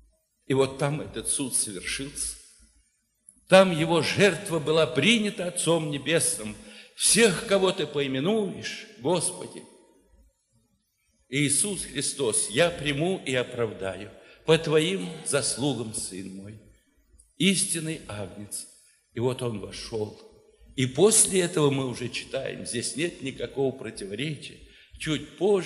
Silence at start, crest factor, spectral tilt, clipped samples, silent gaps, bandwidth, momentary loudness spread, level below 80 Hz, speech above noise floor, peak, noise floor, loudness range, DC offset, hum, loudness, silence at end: 0.5 s; 26 dB; -3.5 dB/octave; under 0.1%; none; 15 kHz; 16 LU; -58 dBFS; 45 dB; -2 dBFS; -71 dBFS; 7 LU; under 0.1%; none; -25 LUFS; 0 s